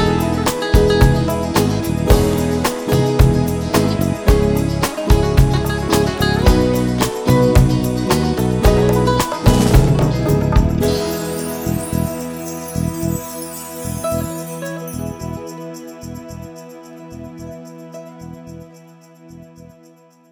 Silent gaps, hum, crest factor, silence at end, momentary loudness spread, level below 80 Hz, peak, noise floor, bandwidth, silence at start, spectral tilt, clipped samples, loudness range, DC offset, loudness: none; none; 16 dB; 0.9 s; 20 LU; -24 dBFS; 0 dBFS; -48 dBFS; over 20 kHz; 0 s; -6 dB/octave; under 0.1%; 18 LU; under 0.1%; -17 LUFS